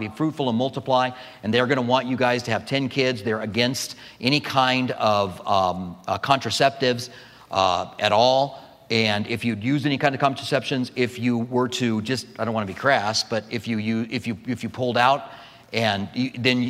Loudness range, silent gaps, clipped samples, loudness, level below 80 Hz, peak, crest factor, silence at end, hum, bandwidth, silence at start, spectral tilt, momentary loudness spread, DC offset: 2 LU; none; under 0.1%; -23 LUFS; -62 dBFS; -4 dBFS; 20 dB; 0 s; none; 15.5 kHz; 0 s; -5 dB/octave; 8 LU; under 0.1%